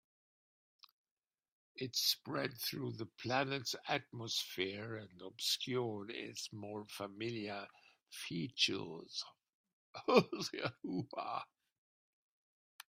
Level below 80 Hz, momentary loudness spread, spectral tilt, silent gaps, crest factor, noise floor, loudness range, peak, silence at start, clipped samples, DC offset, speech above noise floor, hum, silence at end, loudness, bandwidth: -82 dBFS; 14 LU; -3.5 dB/octave; 9.54-9.64 s, 9.73-9.94 s, 11.78-12.79 s; 28 dB; under -90 dBFS; 4 LU; -14 dBFS; 1.75 s; under 0.1%; under 0.1%; over 50 dB; none; 0.15 s; -39 LUFS; 16 kHz